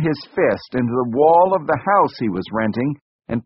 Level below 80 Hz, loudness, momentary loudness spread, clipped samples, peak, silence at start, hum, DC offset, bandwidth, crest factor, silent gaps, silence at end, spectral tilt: -52 dBFS; -18 LUFS; 10 LU; under 0.1%; -2 dBFS; 0 s; none; under 0.1%; 5.8 kHz; 16 dB; 3.01-3.19 s; 0.05 s; -6 dB/octave